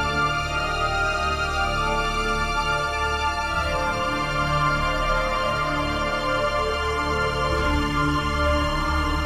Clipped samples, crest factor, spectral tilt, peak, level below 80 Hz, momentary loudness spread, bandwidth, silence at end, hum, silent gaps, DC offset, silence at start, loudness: under 0.1%; 14 dB; -4.5 dB/octave; -8 dBFS; -30 dBFS; 2 LU; 16 kHz; 0 s; none; none; 0.3%; 0 s; -23 LUFS